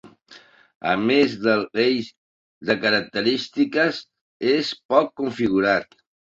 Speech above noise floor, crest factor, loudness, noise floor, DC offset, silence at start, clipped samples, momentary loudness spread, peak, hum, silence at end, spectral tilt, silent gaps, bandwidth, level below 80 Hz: 29 dB; 20 dB; -21 LUFS; -50 dBFS; under 0.1%; 0.05 s; under 0.1%; 8 LU; -2 dBFS; none; 0.5 s; -5.5 dB/octave; 0.75-0.81 s, 2.17-2.61 s, 4.21-4.40 s, 4.85-4.89 s; 7.8 kHz; -60 dBFS